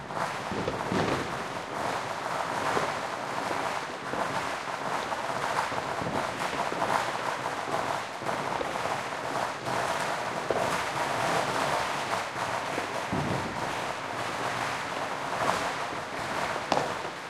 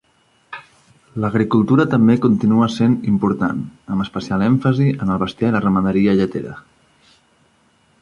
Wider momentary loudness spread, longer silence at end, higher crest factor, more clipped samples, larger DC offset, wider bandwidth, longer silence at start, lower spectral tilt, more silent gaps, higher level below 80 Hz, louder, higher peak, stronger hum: second, 5 LU vs 14 LU; second, 0 s vs 1.45 s; first, 24 dB vs 16 dB; neither; neither; first, 16.5 kHz vs 7.4 kHz; second, 0 s vs 0.5 s; second, -3.5 dB/octave vs -8.5 dB/octave; neither; second, -60 dBFS vs -48 dBFS; second, -30 LUFS vs -17 LUFS; second, -6 dBFS vs -2 dBFS; neither